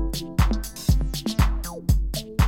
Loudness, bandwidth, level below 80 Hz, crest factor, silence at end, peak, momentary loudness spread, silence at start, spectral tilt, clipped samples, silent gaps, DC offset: -25 LUFS; 17 kHz; -24 dBFS; 16 dB; 0 s; -6 dBFS; 3 LU; 0 s; -5.5 dB/octave; under 0.1%; none; under 0.1%